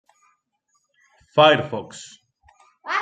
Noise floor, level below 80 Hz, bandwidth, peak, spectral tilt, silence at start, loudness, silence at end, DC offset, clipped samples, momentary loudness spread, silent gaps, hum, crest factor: -71 dBFS; -68 dBFS; 9.2 kHz; -2 dBFS; -4.5 dB/octave; 1.35 s; -19 LUFS; 0 s; under 0.1%; under 0.1%; 25 LU; none; none; 22 dB